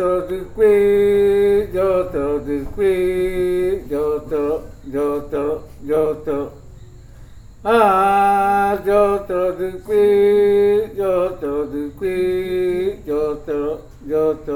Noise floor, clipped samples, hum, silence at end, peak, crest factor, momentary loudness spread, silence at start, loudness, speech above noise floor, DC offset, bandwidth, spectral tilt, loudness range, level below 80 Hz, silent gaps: -39 dBFS; under 0.1%; none; 0 s; -2 dBFS; 16 dB; 11 LU; 0 s; -18 LUFS; 22 dB; under 0.1%; 17 kHz; -6.5 dB/octave; 6 LU; -40 dBFS; none